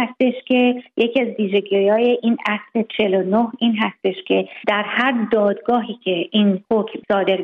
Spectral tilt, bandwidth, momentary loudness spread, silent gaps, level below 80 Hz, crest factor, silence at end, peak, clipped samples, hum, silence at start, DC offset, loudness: -8 dB/octave; 5 kHz; 4 LU; none; -64 dBFS; 14 dB; 0 s; -4 dBFS; under 0.1%; none; 0 s; under 0.1%; -19 LUFS